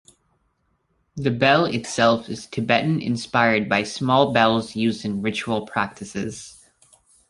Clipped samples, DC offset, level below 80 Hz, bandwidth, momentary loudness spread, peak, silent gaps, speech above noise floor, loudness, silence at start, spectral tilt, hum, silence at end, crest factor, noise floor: under 0.1%; under 0.1%; -56 dBFS; 11.5 kHz; 13 LU; -2 dBFS; none; 47 dB; -21 LUFS; 1.15 s; -5 dB/octave; none; 0.8 s; 22 dB; -69 dBFS